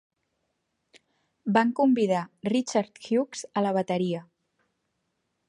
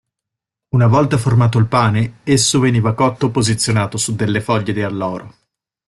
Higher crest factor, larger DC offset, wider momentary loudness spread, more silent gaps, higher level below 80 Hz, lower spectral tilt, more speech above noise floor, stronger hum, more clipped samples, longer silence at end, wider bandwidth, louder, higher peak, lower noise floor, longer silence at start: first, 22 dB vs 14 dB; neither; about the same, 8 LU vs 7 LU; neither; second, -76 dBFS vs -46 dBFS; about the same, -5.5 dB/octave vs -5 dB/octave; second, 52 dB vs 68 dB; neither; neither; first, 1.25 s vs 0.6 s; second, 11 kHz vs 12.5 kHz; second, -26 LUFS vs -16 LUFS; second, -6 dBFS vs -2 dBFS; second, -78 dBFS vs -83 dBFS; first, 1.45 s vs 0.75 s